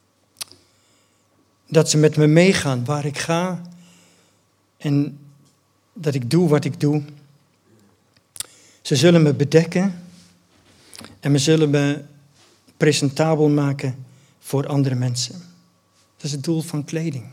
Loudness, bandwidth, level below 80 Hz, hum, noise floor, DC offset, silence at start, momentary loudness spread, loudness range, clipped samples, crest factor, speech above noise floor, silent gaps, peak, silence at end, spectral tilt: -19 LUFS; 15.5 kHz; -68 dBFS; none; -62 dBFS; under 0.1%; 0.4 s; 19 LU; 6 LU; under 0.1%; 20 dB; 44 dB; none; 0 dBFS; 0 s; -5.5 dB/octave